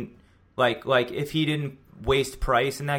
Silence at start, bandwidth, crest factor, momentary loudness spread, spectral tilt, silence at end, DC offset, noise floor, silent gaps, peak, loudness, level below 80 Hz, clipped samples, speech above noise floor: 0 s; 17 kHz; 18 dB; 12 LU; -5 dB/octave; 0 s; under 0.1%; -54 dBFS; none; -8 dBFS; -25 LUFS; -42 dBFS; under 0.1%; 29 dB